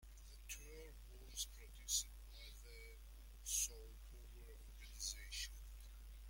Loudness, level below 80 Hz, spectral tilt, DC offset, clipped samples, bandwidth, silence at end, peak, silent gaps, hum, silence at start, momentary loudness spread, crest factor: -47 LUFS; -56 dBFS; 0 dB/octave; under 0.1%; under 0.1%; 16.5 kHz; 0 s; -26 dBFS; none; none; 0 s; 18 LU; 24 dB